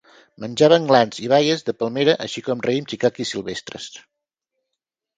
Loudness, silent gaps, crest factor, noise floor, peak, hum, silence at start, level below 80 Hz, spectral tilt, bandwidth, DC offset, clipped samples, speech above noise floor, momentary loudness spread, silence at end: -19 LUFS; none; 20 dB; -82 dBFS; 0 dBFS; none; 0.4 s; -62 dBFS; -5 dB/octave; 9.2 kHz; under 0.1%; under 0.1%; 63 dB; 16 LU; 1.2 s